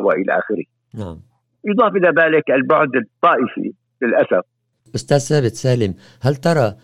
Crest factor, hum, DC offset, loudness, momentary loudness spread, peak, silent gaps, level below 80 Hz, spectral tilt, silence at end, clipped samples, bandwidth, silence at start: 16 dB; none; under 0.1%; -17 LUFS; 15 LU; 0 dBFS; none; -56 dBFS; -6 dB/octave; 0.1 s; under 0.1%; 13 kHz; 0 s